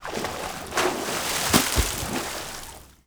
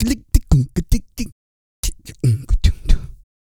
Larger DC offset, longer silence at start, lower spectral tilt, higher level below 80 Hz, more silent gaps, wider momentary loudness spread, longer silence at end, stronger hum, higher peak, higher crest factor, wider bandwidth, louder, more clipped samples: neither; about the same, 0 s vs 0 s; second, -2.5 dB/octave vs -6 dB/octave; second, -38 dBFS vs -20 dBFS; second, none vs 1.32-1.83 s; about the same, 14 LU vs 13 LU; about the same, 0.15 s vs 0.25 s; neither; about the same, -2 dBFS vs 0 dBFS; first, 26 dB vs 18 dB; first, over 20 kHz vs 17 kHz; second, -25 LUFS vs -21 LUFS; neither